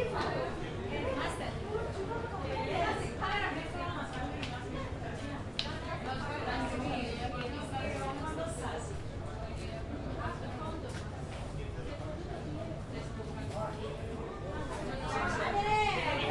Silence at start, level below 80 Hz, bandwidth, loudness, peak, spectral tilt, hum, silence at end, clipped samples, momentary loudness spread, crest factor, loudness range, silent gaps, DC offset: 0 s; -48 dBFS; 11.5 kHz; -37 LUFS; -14 dBFS; -5.5 dB/octave; none; 0 s; under 0.1%; 8 LU; 22 dB; 5 LU; none; under 0.1%